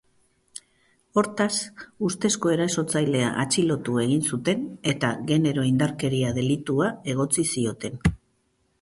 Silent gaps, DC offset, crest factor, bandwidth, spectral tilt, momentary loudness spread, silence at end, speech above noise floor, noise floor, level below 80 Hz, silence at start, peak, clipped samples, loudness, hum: none; under 0.1%; 18 dB; 11.5 kHz; -5 dB/octave; 6 LU; 0.65 s; 45 dB; -69 dBFS; -48 dBFS; 1.15 s; -8 dBFS; under 0.1%; -24 LUFS; none